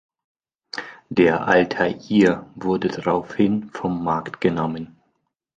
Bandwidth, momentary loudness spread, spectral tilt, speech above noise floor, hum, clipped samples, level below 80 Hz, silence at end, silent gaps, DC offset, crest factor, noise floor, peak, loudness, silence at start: 8.8 kHz; 15 LU; -7 dB/octave; 51 dB; none; under 0.1%; -54 dBFS; 0.7 s; none; under 0.1%; 20 dB; -72 dBFS; -2 dBFS; -21 LUFS; 0.75 s